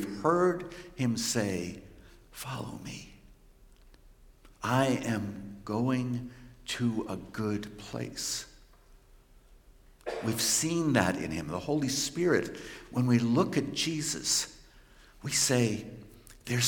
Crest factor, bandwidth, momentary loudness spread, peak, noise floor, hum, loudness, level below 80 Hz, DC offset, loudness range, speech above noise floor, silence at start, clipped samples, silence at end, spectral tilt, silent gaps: 24 dB; 17 kHz; 17 LU; -8 dBFS; -58 dBFS; none; -30 LUFS; -58 dBFS; under 0.1%; 8 LU; 27 dB; 0 s; under 0.1%; 0 s; -4 dB/octave; none